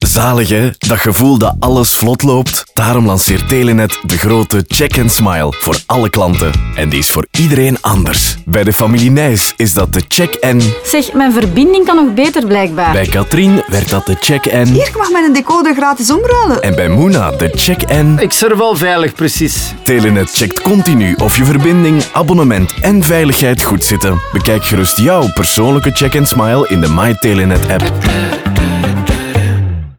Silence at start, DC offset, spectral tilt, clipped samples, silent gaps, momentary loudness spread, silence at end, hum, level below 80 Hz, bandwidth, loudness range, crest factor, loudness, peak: 0 s; 0.6%; -5 dB/octave; under 0.1%; none; 4 LU; 0.05 s; none; -24 dBFS; over 20 kHz; 2 LU; 10 dB; -10 LUFS; 0 dBFS